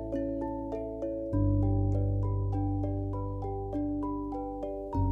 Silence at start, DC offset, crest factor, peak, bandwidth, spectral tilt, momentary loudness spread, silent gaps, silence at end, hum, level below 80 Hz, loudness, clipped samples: 0 s; under 0.1%; 14 dB; -16 dBFS; 2.5 kHz; -12 dB/octave; 8 LU; none; 0 s; none; -38 dBFS; -32 LUFS; under 0.1%